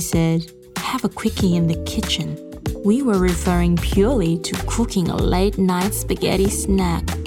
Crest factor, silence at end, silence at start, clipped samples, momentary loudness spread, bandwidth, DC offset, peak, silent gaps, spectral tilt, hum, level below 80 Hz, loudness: 16 dB; 0 s; 0 s; under 0.1%; 6 LU; 17.5 kHz; under 0.1%; -4 dBFS; none; -5.5 dB/octave; none; -28 dBFS; -20 LUFS